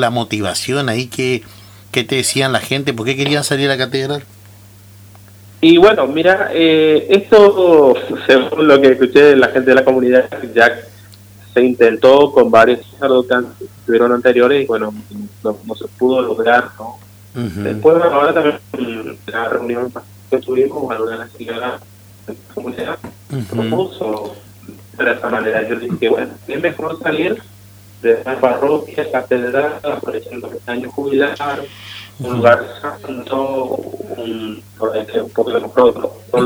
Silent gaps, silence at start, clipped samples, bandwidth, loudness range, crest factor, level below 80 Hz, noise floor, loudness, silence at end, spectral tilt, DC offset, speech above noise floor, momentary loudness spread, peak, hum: none; 0 s; 0.1%; over 20 kHz; 11 LU; 14 dB; -54 dBFS; -40 dBFS; -14 LUFS; 0 s; -5 dB/octave; under 0.1%; 27 dB; 17 LU; 0 dBFS; 50 Hz at -40 dBFS